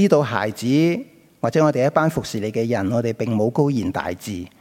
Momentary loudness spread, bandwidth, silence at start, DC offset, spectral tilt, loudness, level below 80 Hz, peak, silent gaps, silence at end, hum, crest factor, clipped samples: 9 LU; 16.5 kHz; 0 s; under 0.1%; -6.5 dB/octave; -21 LUFS; -56 dBFS; -2 dBFS; none; 0.15 s; none; 18 dB; under 0.1%